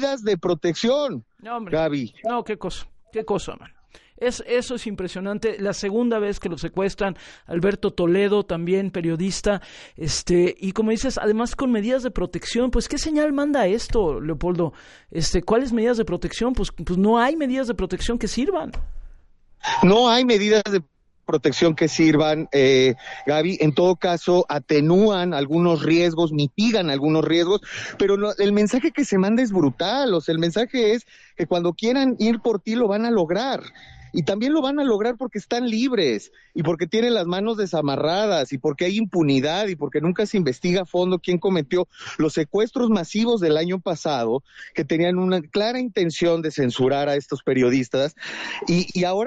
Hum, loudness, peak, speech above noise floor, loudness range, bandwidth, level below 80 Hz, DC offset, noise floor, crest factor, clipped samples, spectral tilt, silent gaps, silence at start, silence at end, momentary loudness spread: none; -21 LUFS; -6 dBFS; 28 dB; 6 LU; 11.5 kHz; -40 dBFS; under 0.1%; -49 dBFS; 16 dB; under 0.1%; -5.5 dB/octave; none; 0 s; 0 s; 9 LU